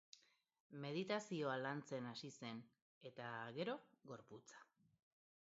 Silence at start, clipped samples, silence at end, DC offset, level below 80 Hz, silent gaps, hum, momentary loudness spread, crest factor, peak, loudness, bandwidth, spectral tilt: 0.15 s; under 0.1%; 0.8 s; under 0.1%; under -90 dBFS; 0.60-0.70 s, 2.82-3.01 s; none; 18 LU; 20 dB; -30 dBFS; -48 LUFS; 7.6 kHz; -4 dB/octave